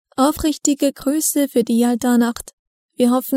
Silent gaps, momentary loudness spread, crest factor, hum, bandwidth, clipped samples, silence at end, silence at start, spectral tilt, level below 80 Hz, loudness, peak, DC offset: 2.53-2.89 s; 4 LU; 16 dB; none; 16 kHz; under 0.1%; 0 s; 0.2 s; -3.5 dB/octave; -46 dBFS; -18 LUFS; -2 dBFS; under 0.1%